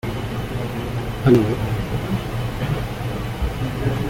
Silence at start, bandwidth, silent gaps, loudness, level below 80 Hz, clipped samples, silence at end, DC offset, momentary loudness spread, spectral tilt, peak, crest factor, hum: 0.05 s; 17 kHz; none; -23 LUFS; -32 dBFS; under 0.1%; 0 s; under 0.1%; 10 LU; -7 dB/octave; -4 dBFS; 18 dB; none